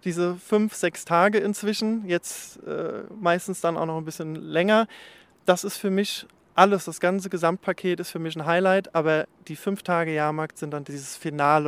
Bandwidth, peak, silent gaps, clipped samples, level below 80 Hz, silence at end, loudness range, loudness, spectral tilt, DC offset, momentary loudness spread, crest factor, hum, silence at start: 16.5 kHz; 0 dBFS; none; under 0.1%; -72 dBFS; 0 s; 3 LU; -25 LUFS; -5 dB/octave; under 0.1%; 12 LU; 24 dB; none; 0.05 s